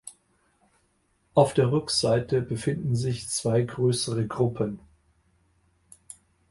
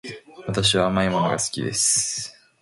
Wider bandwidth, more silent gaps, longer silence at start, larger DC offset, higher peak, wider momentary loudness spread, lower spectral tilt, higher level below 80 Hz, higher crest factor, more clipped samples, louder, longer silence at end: about the same, 11.5 kHz vs 11.5 kHz; neither; about the same, 0.05 s vs 0.05 s; neither; about the same, -6 dBFS vs -6 dBFS; first, 23 LU vs 16 LU; first, -5.5 dB/octave vs -3 dB/octave; second, -56 dBFS vs -48 dBFS; about the same, 22 dB vs 18 dB; neither; second, -25 LUFS vs -21 LUFS; first, 1.7 s vs 0.3 s